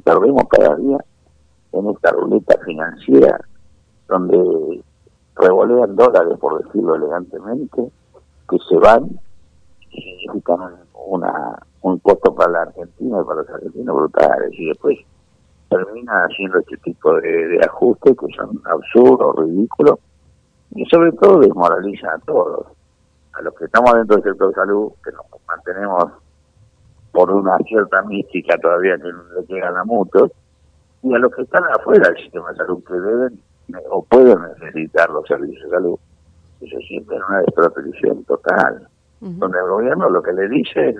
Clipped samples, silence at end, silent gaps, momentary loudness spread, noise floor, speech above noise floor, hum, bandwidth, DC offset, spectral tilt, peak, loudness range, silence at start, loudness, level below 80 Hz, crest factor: 0.1%; 0 s; none; 16 LU; -56 dBFS; 41 dB; none; 8.2 kHz; under 0.1%; -7.5 dB/octave; 0 dBFS; 5 LU; 0.05 s; -15 LUFS; -50 dBFS; 16 dB